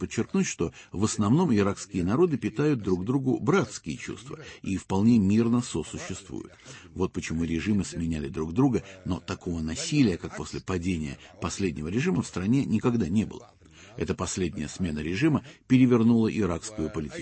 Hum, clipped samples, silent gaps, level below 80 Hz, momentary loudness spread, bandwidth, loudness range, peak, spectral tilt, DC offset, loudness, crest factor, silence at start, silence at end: none; under 0.1%; none; -50 dBFS; 13 LU; 8.8 kHz; 4 LU; -10 dBFS; -6 dB/octave; under 0.1%; -27 LUFS; 18 dB; 0 s; 0 s